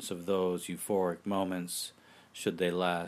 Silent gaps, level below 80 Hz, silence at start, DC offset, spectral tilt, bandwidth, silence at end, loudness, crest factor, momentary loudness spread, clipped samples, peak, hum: none; -74 dBFS; 0 s; under 0.1%; -4.5 dB/octave; 15.5 kHz; 0 s; -33 LUFS; 16 dB; 6 LU; under 0.1%; -16 dBFS; none